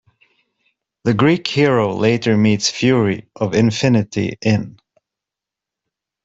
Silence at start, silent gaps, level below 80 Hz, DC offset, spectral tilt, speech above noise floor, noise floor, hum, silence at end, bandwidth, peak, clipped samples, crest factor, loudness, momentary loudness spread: 1.05 s; none; -52 dBFS; under 0.1%; -5.5 dB/octave; 70 dB; -86 dBFS; none; 1.55 s; 8 kHz; -2 dBFS; under 0.1%; 16 dB; -17 LUFS; 6 LU